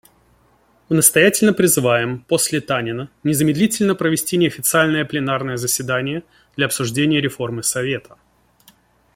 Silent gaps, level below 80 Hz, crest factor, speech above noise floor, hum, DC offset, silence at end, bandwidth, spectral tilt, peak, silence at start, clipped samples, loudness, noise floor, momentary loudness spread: none; -56 dBFS; 18 dB; 39 dB; none; under 0.1%; 1.15 s; 16.5 kHz; -4 dB/octave; 0 dBFS; 0.9 s; under 0.1%; -17 LUFS; -57 dBFS; 9 LU